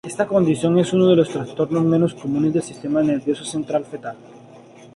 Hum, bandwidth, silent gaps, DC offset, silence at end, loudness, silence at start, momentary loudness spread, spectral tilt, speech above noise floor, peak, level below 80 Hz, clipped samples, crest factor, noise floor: none; 11.5 kHz; none; under 0.1%; 0.35 s; -19 LUFS; 0.05 s; 9 LU; -7 dB/octave; 25 dB; -4 dBFS; -58 dBFS; under 0.1%; 16 dB; -44 dBFS